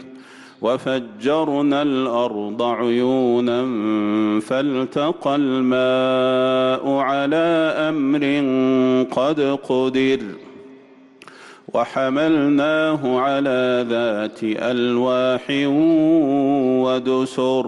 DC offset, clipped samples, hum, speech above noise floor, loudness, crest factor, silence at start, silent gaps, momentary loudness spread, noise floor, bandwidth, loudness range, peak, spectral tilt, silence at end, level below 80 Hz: under 0.1%; under 0.1%; none; 28 dB; -19 LUFS; 10 dB; 0 s; none; 6 LU; -46 dBFS; 11 kHz; 3 LU; -8 dBFS; -6.5 dB/octave; 0 s; -64 dBFS